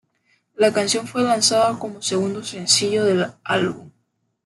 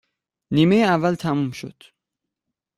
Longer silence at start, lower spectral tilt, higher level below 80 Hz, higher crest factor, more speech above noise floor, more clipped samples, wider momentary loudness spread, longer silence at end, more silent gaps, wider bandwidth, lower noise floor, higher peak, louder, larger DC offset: about the same, 0.6 s vs 0.5 s; second, -3 dB/octave vs -7 dB/octave; second, -66 dBFS vs -58 dBFS; about the same, 20 dB vs 18 dB; second, 50 dB vs 64 dB; neither; second, 10 LU vs 17 LU; second, 0.55 s vs 1.05 s; neither; second, 12.5 kHz vs 14 kHz; second, -70 dBFS vs -84 dBFS; about the same, -2 dBFS vs -4 dBFS; about the same, -19 LUFS vs -20 LUFS; neither